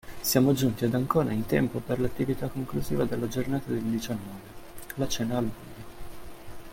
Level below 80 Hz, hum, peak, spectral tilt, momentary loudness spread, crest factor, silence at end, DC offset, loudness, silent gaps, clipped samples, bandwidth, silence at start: -48 dBFS; none; -10 dBFS; -5.5 dB/octave; 22 LU; 20 dB; 0 s; under 0.1%; -28 LUFS; none; under 0.1%; 16.5 kHz; 0.05 s